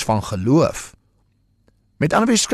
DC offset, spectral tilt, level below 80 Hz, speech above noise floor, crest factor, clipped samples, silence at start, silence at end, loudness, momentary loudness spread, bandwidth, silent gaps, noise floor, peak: under 0.1%; -4.5 dB/octave; -46 dBFS; 44 dB; 14 dB; under 0.1%; 0 s; 0 s; -18 LUFS; 14 LU; 13 kHz; none; -62 dBFS; -6 dBFS